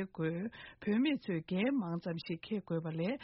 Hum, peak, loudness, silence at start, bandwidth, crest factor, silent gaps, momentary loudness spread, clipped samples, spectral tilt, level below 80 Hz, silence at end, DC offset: none; -22 dBFS; -37 LUFS; 0 s; 5.8 kHz; 14 dB; none; 8 LU; under 0.1%; -6 dB/octave; -72 dBFS; 0 s; under 0.1%